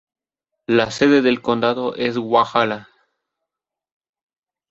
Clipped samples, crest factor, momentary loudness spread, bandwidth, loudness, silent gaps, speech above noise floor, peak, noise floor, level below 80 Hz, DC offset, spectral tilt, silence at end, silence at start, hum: under 0.1%; 18 dB; 8 LU; 8 kHz; -18 LUFS; none; 66 dB; -2 dBFS; -84 dBFS; -58 dBFS; under 0.1%; -5.5 dB/octave; 1.85 s; 0.7 s; none